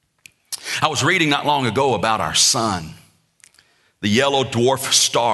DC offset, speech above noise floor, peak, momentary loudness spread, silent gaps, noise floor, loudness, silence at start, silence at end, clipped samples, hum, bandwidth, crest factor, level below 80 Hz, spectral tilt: under 0.1%; 39 dB; -2 dBFS; 12 LU; none; -57 dBFS; -17 LUFS; 0.5 s; 0 s; under 0.1%; none; 12.5 kHz; 18 dB; -54 dBFS; -2.5 dB/octave